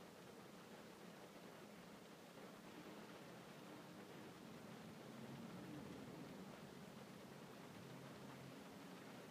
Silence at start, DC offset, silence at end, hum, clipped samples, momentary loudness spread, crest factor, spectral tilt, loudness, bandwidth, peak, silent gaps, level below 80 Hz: 0 s; under 0.1%; 0 s; none; under 0.1%; 4 LU; 14 dB; -5 dB/octave; -58 LUFS; 15.5 kHz; -44 dBFS; none; -86 dBFS